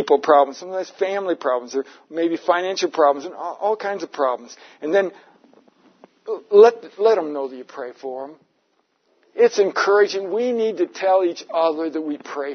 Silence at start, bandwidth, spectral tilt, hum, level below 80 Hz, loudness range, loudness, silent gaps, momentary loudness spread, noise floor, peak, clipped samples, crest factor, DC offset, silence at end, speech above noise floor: 0 s; 6.6 kHz; -4 dB/octave; none; -82 dBFS; 3 LU; -20 LUFS; none; 16 LU; -67 dBFS; 0 dBFS; under 0.1%; 20 dB; under 0.1%; 0 s; 47 dB